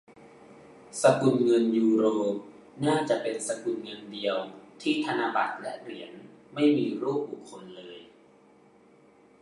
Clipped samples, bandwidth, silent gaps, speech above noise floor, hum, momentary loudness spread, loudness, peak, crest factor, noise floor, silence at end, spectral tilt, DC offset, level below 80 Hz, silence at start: under 0.1%; 11.5 kHz; none; 31 dB; none; 21 LU; -27 LUFS; -8 dBFS; 22 dB; -58 dBFS; 1.35 s; -5 dB/octave; under 0.1%; -76 dBFS; 0.5 s